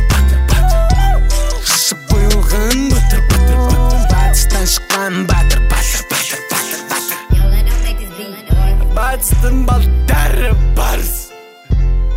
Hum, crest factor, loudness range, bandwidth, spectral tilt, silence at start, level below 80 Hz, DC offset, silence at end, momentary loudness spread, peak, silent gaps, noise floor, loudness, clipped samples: none; 12 dB; 3 LU; 16.5 kHz; -4 dB/octave; 0 s; -12 dBFS; under 0.1%; 0 s; 6 LU; 0 dBFS; none; -33 dBFS; -14 LUFS; under 0.1%